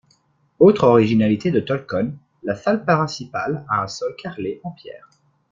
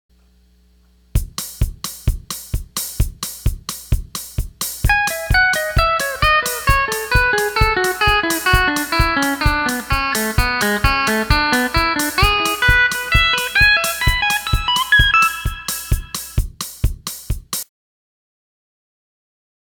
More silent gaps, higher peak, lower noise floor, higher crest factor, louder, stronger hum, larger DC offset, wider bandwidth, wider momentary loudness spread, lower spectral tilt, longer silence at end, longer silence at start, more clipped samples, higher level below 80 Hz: neither; about the same, -2 dBFS vs 0 dBFS; first, -61 dBFS vs -53 dBFS; about the same, 18 dB vs 18 dB; about the same, -19 LUFS vs -17 LUFS; neither; neither; second, 7.6 kHz vs 19.5 kHz; first, 16 LU vs 12 LU; first, -7 dB/octave vs -3 dB/octave; second, 0.55 s vs 2 s; second, 0.6 s vs 1.15 s; neither; second, -58 dBFS vs -24 dBFS